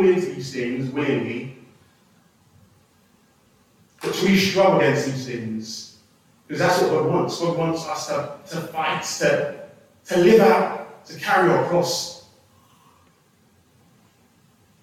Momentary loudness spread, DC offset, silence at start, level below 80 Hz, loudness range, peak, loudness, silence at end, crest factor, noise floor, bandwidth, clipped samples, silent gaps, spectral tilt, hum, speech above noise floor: 16 LU; under 0.1%; 0 s; -62 dBFS; 10 LU; -4 dBFS; -21 LUFS; 2.6 s; 18 dB; -59 dBFS; 16 kHz; under 0.1%; none; -5 dB/octave; none; 38 dB